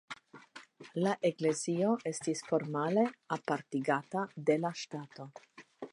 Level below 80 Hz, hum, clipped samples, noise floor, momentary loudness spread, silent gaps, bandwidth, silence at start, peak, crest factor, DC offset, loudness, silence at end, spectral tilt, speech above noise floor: -84 dBFS; none; under 0.1%; -55 dBFS; 19 LU; none; 11.5 kHz; 0.1 s; -16 dBFS; 18 dB; under 0.1%; -34 LUFS; 0.05 s; -5.5 dB/octave; 22 dB